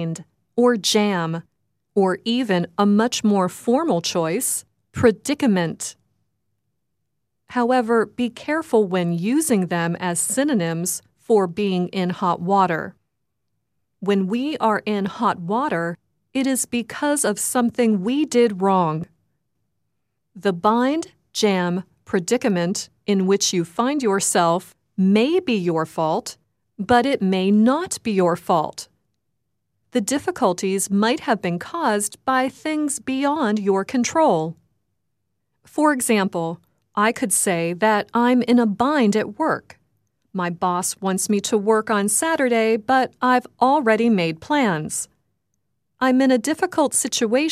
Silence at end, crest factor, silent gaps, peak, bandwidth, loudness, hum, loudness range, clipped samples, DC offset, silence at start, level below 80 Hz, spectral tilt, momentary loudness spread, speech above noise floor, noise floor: 0 s; 18 dB; none; -2 dBFS; 15.5 kHz; -20 LUFS; none; 4 LU; under 0.1%; under 0.1%; 0 s; -62 dBFS; -4.5 dB/octave; 9 LU; 58 dB; -78 dBFS